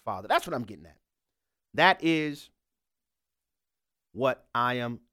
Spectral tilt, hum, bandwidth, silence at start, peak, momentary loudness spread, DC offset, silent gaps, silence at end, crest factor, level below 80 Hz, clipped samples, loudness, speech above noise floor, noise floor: -5 dB/octave; none; 16 kHz; 0.05 s; -8 dBFS; 17 LU; under 0.1%; none; 0.15 s; 22 dB; -68 dBFS; under 0.1%; -27 LUFS; 62 dB; -90 dBFS